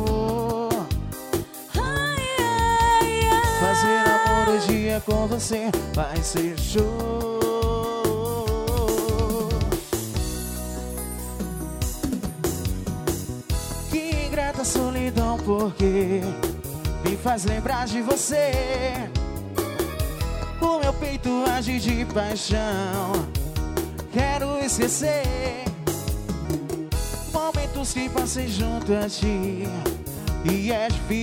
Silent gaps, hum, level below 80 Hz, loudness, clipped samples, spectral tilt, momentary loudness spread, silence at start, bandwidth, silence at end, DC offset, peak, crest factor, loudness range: none; none; -32 dBFS; -24 LUFS; under 0.1%; -4.5 dB/octave; 9 LU; 0 s; 18 kHz; 0 s; under 0.1%; -6 dBFS; 16 dB; 7 LU